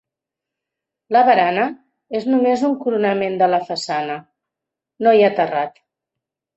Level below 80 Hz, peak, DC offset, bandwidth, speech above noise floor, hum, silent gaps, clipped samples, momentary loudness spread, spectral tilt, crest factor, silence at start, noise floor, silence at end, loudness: -68 dBFS; -2 dBFS; under 0.1%; 8.2 kHz; 68 dB; none; none; under 0.1%; 11 LU; -5.5 dB/octave; 18 dB; 1.1 s; -85 dBFS; 0.85 s; -18 LUFS